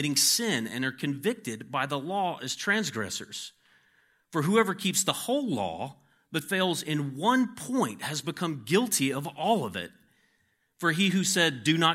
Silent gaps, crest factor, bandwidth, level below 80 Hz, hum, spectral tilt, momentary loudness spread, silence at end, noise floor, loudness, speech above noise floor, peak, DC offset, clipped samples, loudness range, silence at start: none; 20 dB; 16.5 kHz; -74 dBFS; none; -3.5 dB/octave; 11 LU; 0 s; -72 dBFS; -28 LUFS; 44 dB; -8 dBFS; under 0.1%; under 0.1%; 3 LU; 0 s